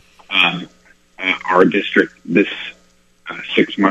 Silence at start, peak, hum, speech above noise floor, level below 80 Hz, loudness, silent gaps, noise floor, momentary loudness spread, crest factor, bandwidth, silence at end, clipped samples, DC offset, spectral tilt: 0.3 s; 0 dBFS; 60 Hz at -50 dBFS; 37 dB; -58 dBFS; -16 LUFS; none; -53 dBFS; 17 LU; 18 dB; 8.4 kHz; 0 s; under 0.1%; under 0.1%; -5.5 dB/octave